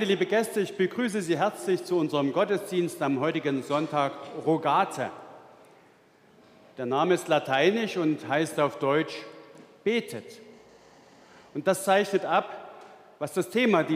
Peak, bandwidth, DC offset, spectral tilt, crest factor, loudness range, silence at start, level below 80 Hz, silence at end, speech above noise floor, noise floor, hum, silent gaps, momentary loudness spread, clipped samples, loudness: -8 dBFS; 15.5 kHz; under 0.1%; -5 dB/octave; 20 dB; 4 LU; 0 s; -80 dBFS; 0 s; 32 dB; -59 dBFS; none; none; 13 LU; under 0.1%; -27 LUFS